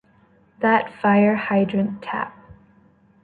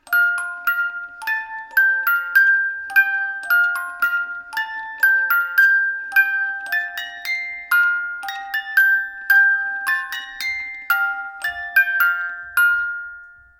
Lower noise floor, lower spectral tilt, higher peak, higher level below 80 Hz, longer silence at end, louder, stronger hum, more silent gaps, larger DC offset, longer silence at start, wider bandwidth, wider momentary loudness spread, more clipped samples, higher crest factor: first, -56 dBFS vs -41 dBFS; first, -9.5 dB/octave vs 1.5 dB/octave; about the same, -6 dBFS vs -4 dBFS; about the same, -60 dBFS vs -62 dBFS; first, 0.7 s vs 0.3 s; about the same, -20 LUFS vs -18 LUFS; neither; neither; neither; first, 0.6 s vs 0.05 s; second, 4.6 kHz vs 18 kHz; about the same, 11 LU vs 12 LU; neither; about the same, 18 dB vs 16 dB